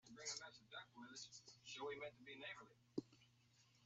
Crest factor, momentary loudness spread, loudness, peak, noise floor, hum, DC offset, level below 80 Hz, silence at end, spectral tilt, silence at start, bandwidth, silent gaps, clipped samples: 26 dB; 8 LU; -54 LUFS; -32 dBFS; -75 dBFS; none; under 0.1%; -90 dBFS; 0 s; -2 dB/octave; 0.05 s; 8 kHz; none; under 0.1%